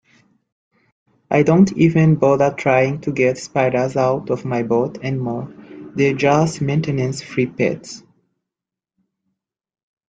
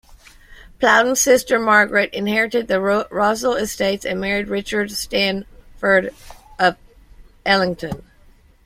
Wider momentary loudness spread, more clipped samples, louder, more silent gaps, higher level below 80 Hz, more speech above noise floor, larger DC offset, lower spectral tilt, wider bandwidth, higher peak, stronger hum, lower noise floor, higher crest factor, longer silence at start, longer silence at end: first, 12 LU vs 9 LU; neither; about the same, -18 LUFS vs -18 LUFS; neither; second, -54 dBFS vs -46 dBFS; first, 69 dB vs 32 dB; neither; first, -7 dB/octave vs -3 dB/octave; second, 9.2 kHz vs 16.5 kHz; about the same, 0 dBFS vs -2 dBFS; neither; first, -86 dBFS vs -50 dBFS; about the same, 18 dB vs 18 dB; first, 1.3 s vs 0.1 s; first, 2.1 s vs 0.65 s